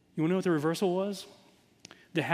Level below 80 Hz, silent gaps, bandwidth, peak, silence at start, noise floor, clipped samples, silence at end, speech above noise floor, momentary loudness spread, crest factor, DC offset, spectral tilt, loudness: -78 dBFS; none; 15.5 kHz; -10 dBFS; 0.15 s; -56 dBFS; under 0.1%; 0 s; 26 dB; 12 LU; 22 dB; under 0.1%; -6 dB/octave; -30 LUFS